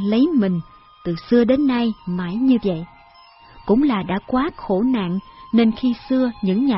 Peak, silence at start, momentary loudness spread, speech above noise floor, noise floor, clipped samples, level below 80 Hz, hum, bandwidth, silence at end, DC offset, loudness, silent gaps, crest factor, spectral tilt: -4 dBFS; 0 s; 11 LU; 29 dB; -48 dBFS; under 0.1%; -48 dBFS; none; 5.8 kHz; 0 s; under 0.1%; -20 LUFS; none; 16 dB; -11.5 dB/octave